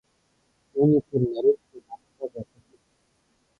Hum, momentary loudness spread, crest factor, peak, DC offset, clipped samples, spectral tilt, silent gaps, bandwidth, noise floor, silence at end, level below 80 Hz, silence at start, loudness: none; 24 LU; 18 dB; -10 dBFS; under 0.1%; under 0.1%; -11.5 dB/octave; none; 4.8 kHz; -69 dBFS; 1.15 s; -62 dBFS; 0.75 s; -24 LUFS